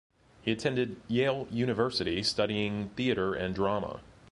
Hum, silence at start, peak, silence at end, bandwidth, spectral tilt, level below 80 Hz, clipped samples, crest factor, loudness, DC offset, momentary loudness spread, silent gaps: none; 0.45 s; -12 dBFS; 0 s; 11.5 kHz; -5.5 dB/octave; -56 dBFS; under 0.1%; 18 dB; -31 LUFS; under 0.1%; 5 LU; none